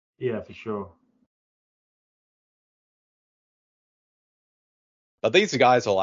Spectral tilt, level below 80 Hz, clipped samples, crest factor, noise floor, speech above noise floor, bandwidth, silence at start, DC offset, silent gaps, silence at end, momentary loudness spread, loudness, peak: -4.5 dB/octave; -66 dBFS; under 0.1%; 26 dB; under -90 dBFS; over 68 dB; 7.6 kHz; 0.2 s; under 0.1%; 1.26-5.18 s; 0 s; 15 LU; -23 LUFS; -4 dBFS